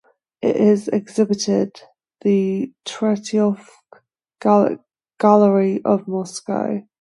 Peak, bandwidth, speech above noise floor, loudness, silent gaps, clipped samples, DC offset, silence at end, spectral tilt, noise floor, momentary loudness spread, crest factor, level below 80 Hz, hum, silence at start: 0 dBFS; 11.5 kHz; 34 dB; -19 LUFS; none; under 0.1%; under 0.1%; 0.2 s; -6.5 dB/octave; -52 dBFS; 11 LU; 18 dB; -68 dBFS; none; 0.4 s